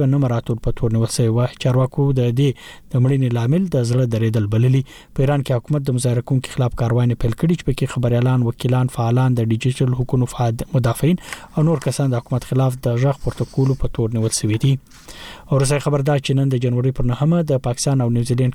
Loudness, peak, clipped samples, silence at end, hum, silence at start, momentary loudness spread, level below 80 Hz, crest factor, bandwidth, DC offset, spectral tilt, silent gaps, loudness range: -19 LUFS; -6 dBFS; under 0.1%; 0 s; none; 0 s; 5 LU; -36 dBFS; 10 dB; 13.5 kHz; under 0.1%; -7 dB/octave; none; 2 LU